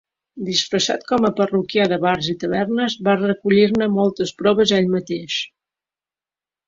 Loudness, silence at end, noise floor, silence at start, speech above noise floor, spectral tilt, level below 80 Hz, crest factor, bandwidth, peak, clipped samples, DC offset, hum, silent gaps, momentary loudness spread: -19 LUFS; 1.2 s; under -90 dBFS; 0.35 s; over 72 dB; -5 dB/octave; -56 dBFS; 16 dB; 7.8 kHz; -2 dBFS; under 0.1%; under 0.1%; none; none; 8 LU